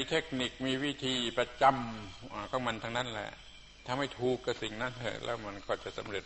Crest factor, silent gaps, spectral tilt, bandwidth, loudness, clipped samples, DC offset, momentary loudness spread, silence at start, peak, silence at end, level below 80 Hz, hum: 22 dB; none; -4.5 dB/octave; 8.2 kHz; -34 LUFS; under 0.1%; under 0.1%; 15 LU; 0 s; -12 dBFS; 0 s; -58 dBFS; none